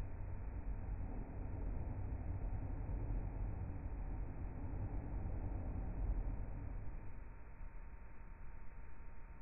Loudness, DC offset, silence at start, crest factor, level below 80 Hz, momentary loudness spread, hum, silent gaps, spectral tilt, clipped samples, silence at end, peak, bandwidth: -48 LUFS; under 0.1%; 0 s; 14 dB; -46 dBFS; 13 LU; none; none; -8 dB/octave; under 0.1%; 0 s; -30 dBFS; 2.7 kHz